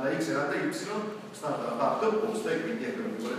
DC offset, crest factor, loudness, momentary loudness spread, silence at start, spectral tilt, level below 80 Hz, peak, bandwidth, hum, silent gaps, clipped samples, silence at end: under 0.1%; 18 dB; -31 LUFS; 7 LU; 0 s; -5 dB/octave; -80 dBFS; -14 dBFS; 15.5 kHz; none; none; under 0.1%; 0 s